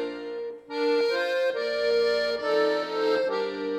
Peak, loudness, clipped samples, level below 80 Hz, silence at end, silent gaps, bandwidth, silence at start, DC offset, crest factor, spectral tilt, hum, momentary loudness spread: -14 dBFS; -26 LUFS; under 0.1%; -66 dBFS; 0 s; none; 12.5 kHz; 0 s; under 0.1%; 12 dB; -3.5 dB/octave; none; 10 LU